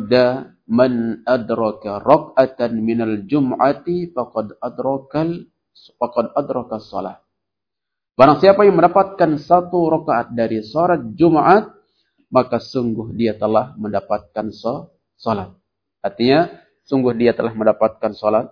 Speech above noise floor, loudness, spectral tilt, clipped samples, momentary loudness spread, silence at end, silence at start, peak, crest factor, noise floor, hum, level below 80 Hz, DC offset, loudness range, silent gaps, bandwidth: 67 dB; -18 LUFS; -8.5 dB/octave; under 0.1%; 13 LU; 0.05 s; 0 s; 0 dBFS; 18 dB; -84 dBFS; none; -54 dBFS; under 0.1%; 8 LU; none; 5.4 kHz